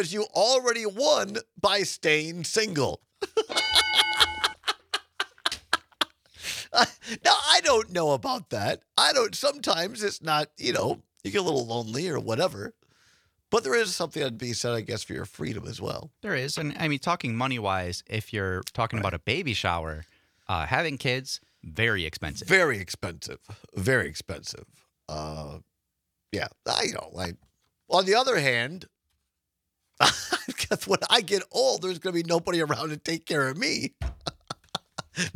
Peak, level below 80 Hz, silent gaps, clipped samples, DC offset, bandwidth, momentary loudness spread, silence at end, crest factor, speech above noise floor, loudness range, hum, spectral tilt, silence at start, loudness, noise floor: -2 dBFS; -54 dBFS; none; under 0.1%; under 0.1%; 17.5 kHz; 14 LU; 0.05 s; 26 dB; 55 dB; 6 LU; none; -3 dB/octave; 0 s; -26 LUFS; -82 dBFS